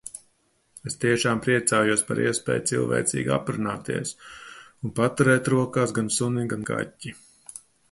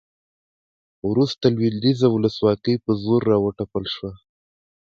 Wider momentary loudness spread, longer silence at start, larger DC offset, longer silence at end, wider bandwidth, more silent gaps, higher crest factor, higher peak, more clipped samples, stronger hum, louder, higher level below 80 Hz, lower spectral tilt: first, 21 LU vs 10 LU; second, 0.05 s vs 1.05 s; neither; second, 0.35 s vs 0.7 s; first, 11.5 kHz vs 7.6 kHz; neither; about the same, 20 dB vs 18 dB; about the same, -4 dBFS vs -4 dBFS; neither; neither; second, -24 LUFS vs -21 LUFS; second, -58 dBFS vs -52 dBFS; second, -4.5 dB/octave vs -8 dB/octave